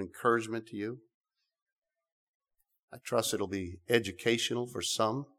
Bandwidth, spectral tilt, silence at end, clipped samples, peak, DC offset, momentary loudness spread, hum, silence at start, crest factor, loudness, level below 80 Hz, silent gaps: 17.5 kHz; -3.5 dB/octave; 0.15 s; under 0.1%; -12 dBFS; under 0.1%; 10 LU; none; 0 s; 24 dB; -32 LUFS; -70 dBFS; 1.14-1.21 s, 1.62-1.66 s, 1.72-1.82 s, 2.12-2.40 s, 2.83-2.88 s